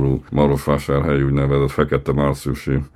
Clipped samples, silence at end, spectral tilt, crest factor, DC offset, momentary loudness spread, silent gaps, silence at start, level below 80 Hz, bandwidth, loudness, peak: under 0.1%; 0.1 s; -8 dB/octave; 18 dB; under 0.1%; 4 LU; none; 0 s; -32 dBFS; 14 kHz; -19 LUFS; 0 dBFS